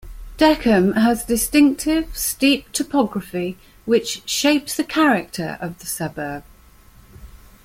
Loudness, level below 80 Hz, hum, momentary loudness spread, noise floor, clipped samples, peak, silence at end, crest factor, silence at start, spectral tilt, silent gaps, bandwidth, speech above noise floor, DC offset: -19 LUFS; -42 dBFS; none; 12 LU; -48 dBFS; under 0.1%; -2 dBFS; 0.3 s; 18 dB; 0.05 s; -4 dB/octave; none; 16.5 kHz; 29 dB; under 0.1%